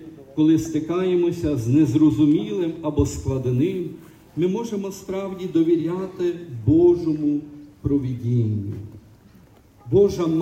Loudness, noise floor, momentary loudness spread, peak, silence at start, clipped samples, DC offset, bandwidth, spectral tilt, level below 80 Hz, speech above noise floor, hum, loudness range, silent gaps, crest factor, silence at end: -21 LUFS; -51 dBFS; 12 LU; -6 dBFS; 0 s; under 0.1%; under 0.1%; 14.5 kHz; -8 dB/octave; -44 dBFS; 30 dB; none; 4 LU; none; 14 dB; 0 s